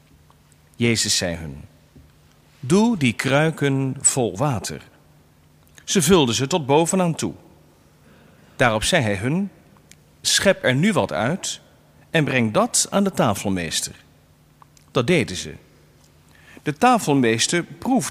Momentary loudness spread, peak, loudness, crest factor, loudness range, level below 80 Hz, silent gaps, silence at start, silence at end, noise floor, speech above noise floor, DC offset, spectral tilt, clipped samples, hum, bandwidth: 13 LU; -2 dBFS; -20 LUFS; 20 dB; 3 LU; -50 dBFS; none; 0.8 s; 0 s; -54 dBFS; 34 dB; under 0.1%; -4 dB/octave; under 0.1%; none; 15.5 kHz